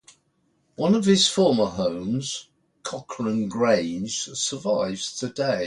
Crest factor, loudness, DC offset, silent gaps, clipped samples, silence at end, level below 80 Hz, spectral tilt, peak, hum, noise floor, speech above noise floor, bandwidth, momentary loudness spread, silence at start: 18 dB; -23 LUFS; under 0.1%; none; under 0.1%; 0 s; -60 dBFS; -4 dB/octave; -8 dBFS; none; -68 dBFS; 45 dB; 11.5 kHz; 14 LU; 0.8 s